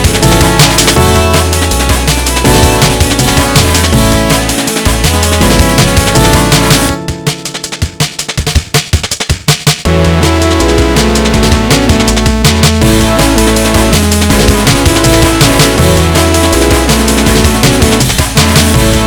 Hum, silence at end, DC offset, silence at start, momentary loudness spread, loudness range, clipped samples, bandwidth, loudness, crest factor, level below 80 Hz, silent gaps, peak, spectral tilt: none; 0 s; under 0.1%; 0 s; 5 LU; 3 LU; 2%; over 20 kHz; -8 LUFS; 8 dB; -16 dBFS; none; 0 dBFS; -4 dB/octave